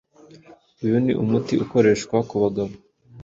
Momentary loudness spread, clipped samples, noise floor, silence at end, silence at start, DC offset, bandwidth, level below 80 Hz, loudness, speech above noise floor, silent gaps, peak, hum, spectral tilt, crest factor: 10 LU; under 0.1%; -49 dBFS; 0 s; 0.8 s; under 0.1%; 7.8 kHz; -54 dBFS; -21 LUFS; 29 dB; none; -4 dBFS; none; -7 dB/octave; 18 dB